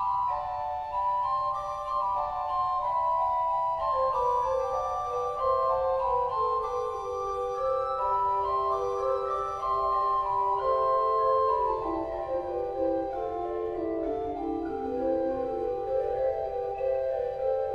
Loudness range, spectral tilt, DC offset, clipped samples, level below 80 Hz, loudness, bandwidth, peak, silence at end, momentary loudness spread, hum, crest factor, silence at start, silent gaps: 4 LU; -6.5 dB/octave; under 0.1%; under 0.1%; -52 dBFS; -29 LUFS; 7.8 kHz; -14 dBFS; 0 s; 6 LU; none; 14 dB; 0 s; none